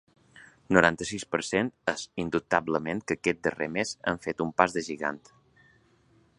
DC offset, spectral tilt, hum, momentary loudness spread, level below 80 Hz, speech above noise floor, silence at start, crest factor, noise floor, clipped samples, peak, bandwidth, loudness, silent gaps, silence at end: under 0.1%; -4.5 dB/octave; none; 9 LU; -58 dBFS; 35 dB; 0.35 s; 28 dB; -63 dBFS; under 0.1%; -2 dBFS; 11.5 kHz; -28 LUFS; none; 1.2 s